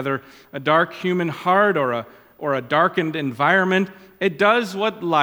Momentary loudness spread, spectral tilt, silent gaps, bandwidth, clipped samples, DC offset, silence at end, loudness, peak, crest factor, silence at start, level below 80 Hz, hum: 10 LU; -6 dB/octave; none; 18 kHz; under 0.1%; under 0.1%; 0 s; -20 LUFS; -2 dBFS; 18 dB; 0 s; -68 dBFS; none